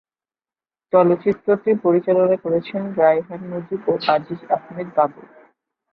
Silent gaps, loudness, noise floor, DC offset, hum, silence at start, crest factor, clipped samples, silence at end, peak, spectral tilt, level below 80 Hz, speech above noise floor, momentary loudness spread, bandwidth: none; -19 LUFS; under -90 dBFS; under 0.1%; none; 0.95 s; 18 dB; under 0.1%; 0.7 s; -2 dBFS; -9.5 dB/octave; -66 dBFS; over 71 dB; 8 LU; 5.6 kHz